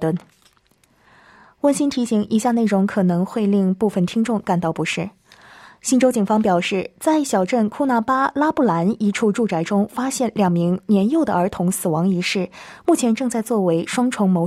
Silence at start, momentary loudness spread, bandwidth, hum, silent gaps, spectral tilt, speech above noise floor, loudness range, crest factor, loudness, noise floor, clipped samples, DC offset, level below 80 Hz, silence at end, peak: 0 s; 5 LU; 15 kHz; none; none; -6 dB/octave; 40 dB; 2 LU; 14 dB; -19 LUFS; -59 dBFS; under 0.1%; under 0.1%; -58 dBFS; 0 s; -6 dBFS